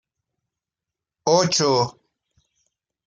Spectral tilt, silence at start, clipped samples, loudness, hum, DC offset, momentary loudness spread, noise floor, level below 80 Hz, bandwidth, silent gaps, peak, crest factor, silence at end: -3.5 dB/octave; 1.25 s; under 0.1%; -20 LUFS; none; under 0.1%; 10 LU; -87 dBFS; -66 dBFS; 10 kHz; none; -4 dBFS; 22 dB; 1.15 s